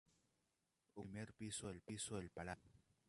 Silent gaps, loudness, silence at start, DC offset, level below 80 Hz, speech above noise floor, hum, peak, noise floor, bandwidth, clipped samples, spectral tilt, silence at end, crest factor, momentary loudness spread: none; -51 LUFS; 0.95 s; under 0.1%; -72 dBFS; 37 dB; none; -34 dBFS; -88 dBFS; 11.5 kHz; under 0.1%; -4 dB/octave; 0.3 s; 20 dB; 9 LU